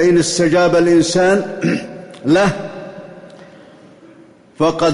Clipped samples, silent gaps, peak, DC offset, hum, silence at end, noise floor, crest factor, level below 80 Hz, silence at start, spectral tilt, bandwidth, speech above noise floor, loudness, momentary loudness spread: under 0.1%; none; -4 dBFS; under 0.1%; none; 0 s; -44 dBFS; 12 dB; -50 dBFS; 0 s; -5 dB/octave; 11 kHz; 31 dB; -15 LUFS; 20 LU